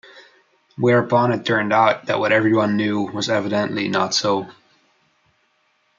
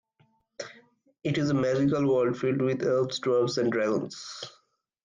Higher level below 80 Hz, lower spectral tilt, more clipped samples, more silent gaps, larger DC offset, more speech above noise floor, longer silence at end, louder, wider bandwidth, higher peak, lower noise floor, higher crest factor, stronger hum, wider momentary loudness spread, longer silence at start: about the same, -66 dBFS vs -66 dBFS; about the same, -5 dB/octave vs -6 dB/octave; neither; neither; neither; first, 46 dB vs 42 dB; first, 1.5 s vs 0.55 s; first, -19 LUFS vs -27 LUFS; second, 7.6 kHz vs 9.6 kHz; first, -2 dBFS vs -16 dBFS; second, -64 dBFS vs -68 dBFS; first, 18 dB vs 12 dB; neither; second, 6 LU vs 17 LU; second, 0.15 s vs 0.6 s